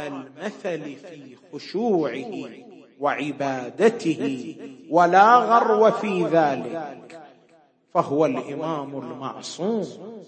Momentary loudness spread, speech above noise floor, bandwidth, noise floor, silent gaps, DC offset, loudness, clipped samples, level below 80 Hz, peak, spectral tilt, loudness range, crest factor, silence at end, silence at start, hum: 21 LU; 35 dB; 8.8 kHz; -58 dBFS; none; under 0.1%; -22 LUFS; under 0.1%; -76 dBFS; -2 dBFS; -6 dB/octave; 9 LU; 22 dB; 0.05 s; 0 s; none